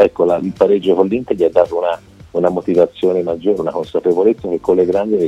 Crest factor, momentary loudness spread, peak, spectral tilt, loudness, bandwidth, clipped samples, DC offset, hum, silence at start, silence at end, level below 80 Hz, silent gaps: 14 dB; 6 LU; 0 dBFS; -8 dB/octave; -15 LUFS; 8.8 kHz; under 0.1%; under 0.1%; none; 0 s; 0 s; -50 dBFS; none